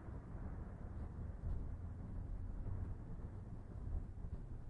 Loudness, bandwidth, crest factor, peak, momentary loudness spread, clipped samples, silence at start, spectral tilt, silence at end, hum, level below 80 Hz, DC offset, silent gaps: -50 LUFS; 3.6 kHz; 14 dB; -32 dBFS; 4 LU; under 0.1%; 0 s; -10 dB/octave; 0 s; none; -48 dBFS; under 0.1%; none